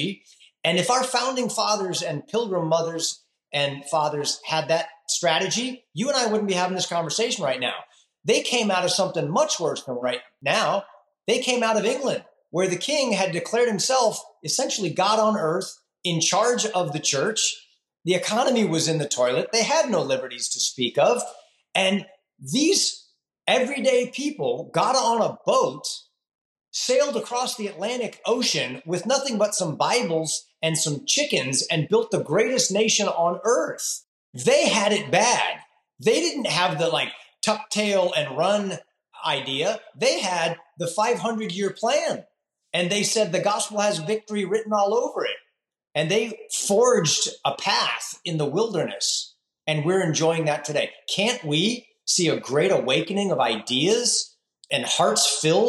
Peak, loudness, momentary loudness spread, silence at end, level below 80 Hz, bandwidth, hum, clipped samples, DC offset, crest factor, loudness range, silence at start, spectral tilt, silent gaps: -6 dBFS; -23 LUFS; 8 LU; 0 s; -76 dBFS; 13 kHz; none; under 0.1%; under 0.1%; 18 dB; 3 LU; 0 s; -3 dB/octave; 26.35-26.56 s, 34.08-34.33 s